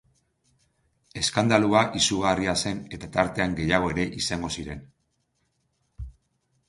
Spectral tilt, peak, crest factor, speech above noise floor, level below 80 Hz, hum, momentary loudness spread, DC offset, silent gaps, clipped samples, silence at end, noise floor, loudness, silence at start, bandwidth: -4 dB/octave; -4 dBFS; 22 dB; 49 dB; -48 dBFS; none; 21 LU; under 0.1%; none; under 0.1%; 0.55 s; -73 dBFS; -24 LUFS; 1.15 s; 11.5 kHz